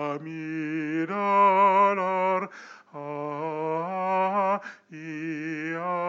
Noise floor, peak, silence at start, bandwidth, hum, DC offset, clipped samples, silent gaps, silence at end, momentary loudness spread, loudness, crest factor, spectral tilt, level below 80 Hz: -46 dBFS; -10 dBFS; 0 s; 7.4 kHz; none; under 0.1%; under 0.1%; none; 0 s; 18 LU; -26 LUFS; 16 dB; -7 dB/octave; under -90 dBFS